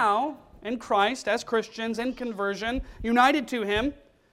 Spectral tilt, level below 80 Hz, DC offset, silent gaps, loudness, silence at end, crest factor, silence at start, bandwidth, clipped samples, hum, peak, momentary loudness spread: -4 dB/octave; -48 dBFS; under 0.1%; none; -27 LUFS; 0.4 s; 20 dB; 0 s; 15 kHz; under 0.1%; none; -8 dBFS; 11 LU